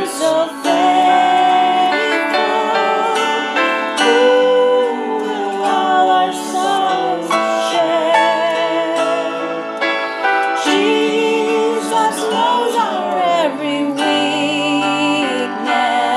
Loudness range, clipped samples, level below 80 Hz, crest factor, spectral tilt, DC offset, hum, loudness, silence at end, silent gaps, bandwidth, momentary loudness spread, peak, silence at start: 2 LU; under 0.1%; -74 dBFS; 14 dB; -3 dB/octave; under 0.1%; none; -15 LUFS; 0 s; none; 14.5 kHz; 6 LU; 0 dBFS; 0 s